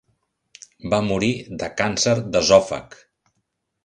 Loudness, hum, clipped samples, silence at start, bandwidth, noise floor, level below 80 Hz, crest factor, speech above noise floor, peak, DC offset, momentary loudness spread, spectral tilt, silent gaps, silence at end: -20 LUFS; none; under 0.1%; 0.85 s; 11 kHz; -74 dBFS; -50 dBFS; 22 dB; 54 dB; 0 dBFS; under 0.1%; 14 LU; -4 dB/octave; none; 0.9 s